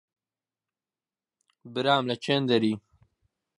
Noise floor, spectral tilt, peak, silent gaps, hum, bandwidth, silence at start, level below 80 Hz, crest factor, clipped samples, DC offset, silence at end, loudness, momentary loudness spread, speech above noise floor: under -90 dBFS; -6 dB/octave; -8 dBFS; none; none; 11 kHz; 1.65 s; -72 dBFS; 22 dB; under 0.1%; under 0.1%; 0.8 s; -26 LUFS; 11 LU; over 65 dB